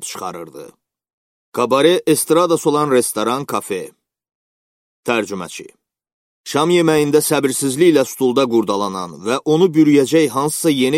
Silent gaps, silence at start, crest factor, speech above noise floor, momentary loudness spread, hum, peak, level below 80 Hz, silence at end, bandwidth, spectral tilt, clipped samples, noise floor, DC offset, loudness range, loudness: 1.13-1.52 s, 4.35-5.03 s, 6.13-6.44 s; 0 s; 16 dB; over 74 dB; 14 LU; none; 0 dBFS; -62 dBFS; 0 s; 16.5 kHz; -4.5 dB/octave; under 0.1%; under -90 dBFS; under 0.1%; 7 LU; -16 LUFS